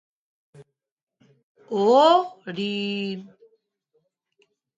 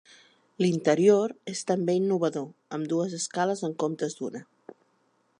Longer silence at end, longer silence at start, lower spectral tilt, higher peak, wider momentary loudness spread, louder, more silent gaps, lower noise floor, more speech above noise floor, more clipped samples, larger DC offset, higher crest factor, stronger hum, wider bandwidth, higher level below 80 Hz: first, 1.5 s vs 0.95 s; about the same, 0.6 s vs 0.6 s; about the same, -5.5 dB/octave vs -5.5 dB/octave; first, -4 dBFS vs -8 dBFS; about the same, 16 LU vs 15 LU; first, -21 LUFS vs -27 LUFS; first, 0.92-0.97 s, 1.03-1.07 s, 1.43-1.55 s vs none; first, -86 dBFS vs -69 dBFS; first, 65 dB vs 43 dB; neither; neither; about the same, 20 dB vs 20 dB; neither; second, 9.2 kHz vs 11 kHz; about the same, -78 dBFS vs -78 dBFS